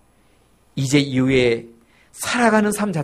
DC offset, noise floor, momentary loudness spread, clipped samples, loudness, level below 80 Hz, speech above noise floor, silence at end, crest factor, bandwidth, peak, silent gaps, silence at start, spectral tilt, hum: under 0.1%; -56 dBFS; 10 LU; under 0.1%; -19 LUFS; -48 dBFS; 38 dB; 0 s; 16 dB; 15.5 kHz; -4 dBFS; none; 0.75 s; -5 dB/octave; none